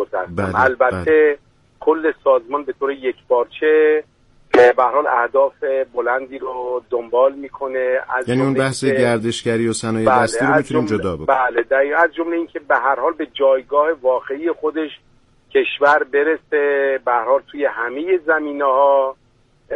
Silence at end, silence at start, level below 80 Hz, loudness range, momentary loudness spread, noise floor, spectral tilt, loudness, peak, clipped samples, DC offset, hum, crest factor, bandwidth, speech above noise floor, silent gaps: 0 s; 0 s; -54 dBFS; 3 LU; 8 LU; -55 dBFS; -5.5 dB/octave; -17 LUFS; -2 dBFS; under 0.1%; under 0.1%; none; 16 dB; 11.5 kHz; 38 dB; none